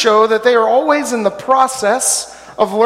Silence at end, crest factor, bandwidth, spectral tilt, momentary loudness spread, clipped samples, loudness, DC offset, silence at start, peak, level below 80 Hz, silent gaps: 0 s; 14 dB; 16 kHz; -2 dB/octave; 7 LU; under 0.1%; -13 LUFS; under 0.1%; 0 s; 0 dBFS; -56 dBFS; none